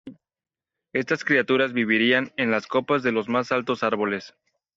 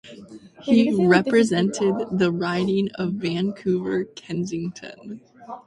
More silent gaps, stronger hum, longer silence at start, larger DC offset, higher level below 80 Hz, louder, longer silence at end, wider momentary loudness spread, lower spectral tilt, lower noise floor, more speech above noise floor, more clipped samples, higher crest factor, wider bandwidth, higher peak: neither; neither; about the same, 0.05 s vs 0.05 s; neither; second, -68 dBFS vs -60 dBFS; about the same, -23 LUFS vs -22 LUFS; first, 0.45 s vs 0.1 s; second, 7 LU vs 22 LU; second, -2.5 dB/octave vs -6 dB/octave; first, -53 dBFS vs -43 dBFS; first, 30 dB vs 22 dB; neither; about the same, 18 dB vs 18 dB; second, 7.6 kHz vs 11.5 kHz; second, -8 dBFS vs -4 dBFS